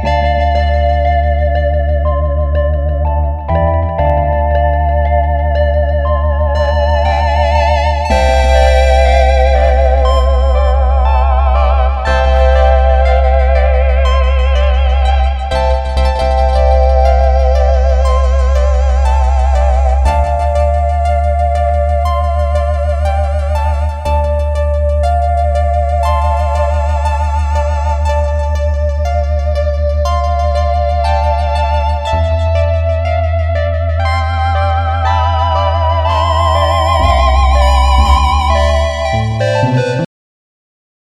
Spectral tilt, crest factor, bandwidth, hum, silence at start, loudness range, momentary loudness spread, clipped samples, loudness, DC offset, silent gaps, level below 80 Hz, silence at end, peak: -6.5 dB/octave; 10 dB; 9 kHz; none; 0 s; 4 LU; 5 LU; under 0.1%; -13 LUFS; under 0.1%; none; -14 dBFS; 1 s; 0 dBFS